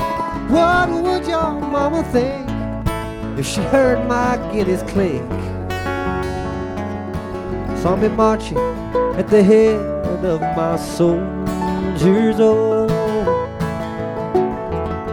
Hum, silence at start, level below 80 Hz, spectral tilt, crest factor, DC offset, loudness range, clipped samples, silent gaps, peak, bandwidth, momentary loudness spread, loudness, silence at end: none; 0 s; -34 dBFS; -6.5 dB/octave; 16 dB; under 0.1%; 4 LU; under 0.1%; none; -2 dBFS; 18 kHz; 11 LU; -18 LUFS; 0 s